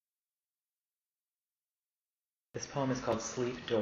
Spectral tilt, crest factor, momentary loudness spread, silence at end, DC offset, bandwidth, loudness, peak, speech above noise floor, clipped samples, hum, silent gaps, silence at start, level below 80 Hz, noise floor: -5 dB/octave; 20 dB; 10 LU; 0 s; under 0.1%; 7.6 kHz; -36 LUFS; -18 dBFS; over 55 dB; under 0.1%; none; none; 2.55 s; -66 dBFS; under -90 dBFS